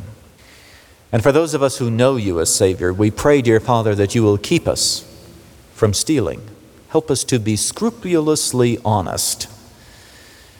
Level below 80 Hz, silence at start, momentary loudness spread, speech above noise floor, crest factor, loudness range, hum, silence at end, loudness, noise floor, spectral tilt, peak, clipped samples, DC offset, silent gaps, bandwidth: -46 dBFS; 0 s; 6 LU; 29 dB; 16 dB; 4 LU; none; 1.05 s; -17 LUFS; -46 dBFS; -4.5 dB/octave; -2 dBFS; under 0.1%; under 0.1%; none; over 20 kHz